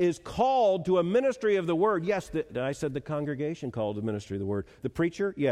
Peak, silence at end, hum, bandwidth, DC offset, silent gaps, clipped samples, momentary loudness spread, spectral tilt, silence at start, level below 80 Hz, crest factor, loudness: -12 dBFS; 0 s; none; 13 kHz; under 0.1%; none; under 0.1%; 9 LU; -6.5 dB/octave; 0 s; -56 dBFS; 14 dB; -29 LUFS